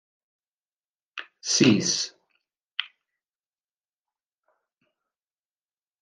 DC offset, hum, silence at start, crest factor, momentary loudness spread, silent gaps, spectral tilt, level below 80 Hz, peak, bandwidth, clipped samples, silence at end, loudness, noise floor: under 0.1%; none; 1.15 s; 26 dB; 21 LU; 2.63-2.67 s, 2.73-2.77 s; -3 dB/octave; -72 dBFS; -6 dBFS; 11 kHz; under 0.1%; 3.15 s; -24 LUFS; under -90 dBFS